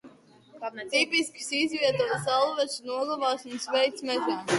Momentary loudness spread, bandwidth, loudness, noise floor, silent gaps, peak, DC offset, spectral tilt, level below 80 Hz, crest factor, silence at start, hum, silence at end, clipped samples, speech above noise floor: 7 LU; 11.5 kHz; -27 LUFS; -54 dBFS; none; -12 dBFS; under 0.1%; -3 dB/octave; -74 dBFS; 18 dB; 0.05 s; none; 0 s; under 0.1%; 26 dB